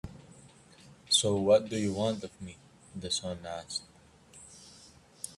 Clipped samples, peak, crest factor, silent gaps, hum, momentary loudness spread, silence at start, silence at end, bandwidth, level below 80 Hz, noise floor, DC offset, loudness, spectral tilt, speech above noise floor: under 0.1%; -12 dBFS; 22 dB; none; none; 25 LU; 0.05 s; 0.05 s; 13 kHz; -64 dBFS; -57 dBFS; under 0.1%; -30 LUFS; -3.5 dB/octave; 26 dB